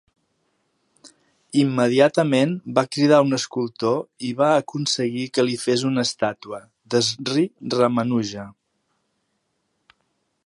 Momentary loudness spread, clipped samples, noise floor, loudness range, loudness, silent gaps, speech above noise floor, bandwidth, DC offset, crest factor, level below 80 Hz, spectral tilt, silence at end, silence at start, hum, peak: 9 LU; under 0.1%; -73 dBFS; 5 LU; -21 LUFS; none; 52 dB; 11.5 kHz; under 0.1%; 20 dB; -68 dBFS; -5 dB/octave; 1.95 s; 1.05 s; none; -2 dBFS